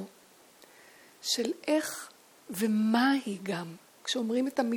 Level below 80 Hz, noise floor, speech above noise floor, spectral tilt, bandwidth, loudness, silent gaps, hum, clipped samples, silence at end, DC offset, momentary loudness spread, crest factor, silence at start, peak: -82 dBFS; -58 dBFS; 29 dB; -4 dB/octave; 18.5 kHz; -30 LUFS; none; none; under 0.1%; 0 s; under 0.1%; 16 LU; 18 dB; 0 s; -12 dBFS